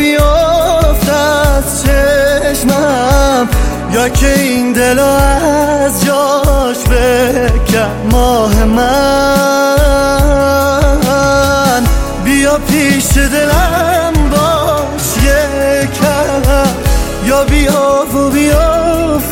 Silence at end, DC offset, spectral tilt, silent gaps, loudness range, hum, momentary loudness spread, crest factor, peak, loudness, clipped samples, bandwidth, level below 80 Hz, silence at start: 0 s; under 0.1%; -4.5 dB/octave; none; 1 LU; none; 3 LU; 10 dB; 0 dBFS; -10 LUFS; under 0.1%; 17.5 kHz; -16 dBFS; 0 s